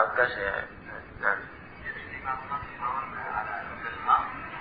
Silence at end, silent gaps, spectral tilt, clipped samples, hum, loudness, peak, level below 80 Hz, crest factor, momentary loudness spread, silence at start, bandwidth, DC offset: 0 s; none; -8 dB/octave; under 0.1%; none; -30 LUFS; -6 dBFS; -54 dBFS; 24 dB; 14 LU; 0 s; 5 kHz; under 0.1%